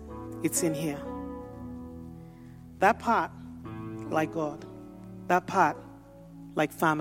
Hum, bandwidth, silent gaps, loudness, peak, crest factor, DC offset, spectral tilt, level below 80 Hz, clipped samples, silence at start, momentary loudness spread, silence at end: none; 16 kHz; none; -29 LUFS; -8 dBFS; 22 dB; under 0.1%; -4.5 dB/octave; -56 dBFS; under 0.1%; 0 s; 22 LU; 0 s